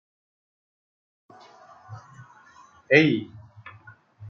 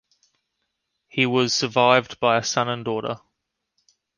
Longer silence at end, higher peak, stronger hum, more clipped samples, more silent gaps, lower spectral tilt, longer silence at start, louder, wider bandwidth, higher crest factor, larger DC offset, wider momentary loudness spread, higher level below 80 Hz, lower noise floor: second, 0 s vs 1 s; about the same, -2 dBFS vs -2 dBFS; neither; neither; neither; about the same, -4.5 dB/octave vs -3.5 dB/octave; first, 1.9 s vs 1.15 s; about the same, -20 LUFS vs -21 LUFS; second, 6.8 kHz vs 10.5 kHz; about the same, 26 dB vs 22 dB; neither; first, 28 LU vs 13 LU; second, -74 dBFS vs -64 dBFS; second, -53 dBFS vs -79 dBFS